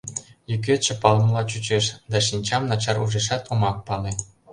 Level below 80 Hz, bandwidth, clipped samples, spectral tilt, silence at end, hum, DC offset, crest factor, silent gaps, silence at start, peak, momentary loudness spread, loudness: -48 dBFS; 11 kHz; under 0.1%; -4 dB/octave; 0 s; none; under 0.1%; 22 dB; none; 0.05 s; 0 dBFS; 11 LU; -23 LUFS